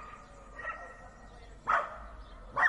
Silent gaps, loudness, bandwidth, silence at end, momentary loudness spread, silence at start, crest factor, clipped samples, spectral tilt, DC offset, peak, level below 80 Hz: none; -36 LUFS; 11.5 kHz; 0 s; 21 LU; 0 s; 22 dB; under 0.1%; -4 dB/octave; under 0.1%; -14 dBFS; -54 dBFS